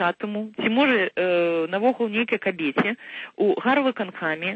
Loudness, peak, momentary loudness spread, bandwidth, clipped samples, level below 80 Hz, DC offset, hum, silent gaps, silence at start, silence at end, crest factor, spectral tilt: -23 LUFS; -8 dBFS; 8 LU; 7.8 kHz; under 0.1%; -70 dBFS; under 0.1%; none; none; 0 s; 0 s; 16 dB; -7 dB/octave